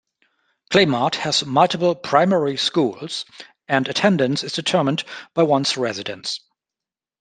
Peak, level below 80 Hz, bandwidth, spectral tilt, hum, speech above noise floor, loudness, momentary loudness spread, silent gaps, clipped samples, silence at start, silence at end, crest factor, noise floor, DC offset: 0 dBFS; -64 dBFS; 9.8 kHz; -4.5 dB/octave; none; 69 dB; -20 LUFS; 11 LU; none; under 0.1%; 0.7 s; 0.85 s; 20 dB; -89 dBFS; under 0.1%